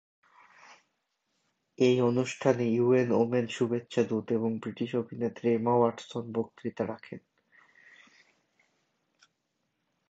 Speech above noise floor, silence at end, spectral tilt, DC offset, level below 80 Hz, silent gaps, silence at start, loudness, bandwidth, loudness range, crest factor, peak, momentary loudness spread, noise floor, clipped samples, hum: 52 dB; 2.9 s; -6.5 dB/octave; under 0.1%; -74 dBFS; none; 0.7 s; -29 LUFS; 8.2 kHz; 12 LU; 22 dB; -10 dBFS; 11 LU; -80 dBFS; under 0.1%; none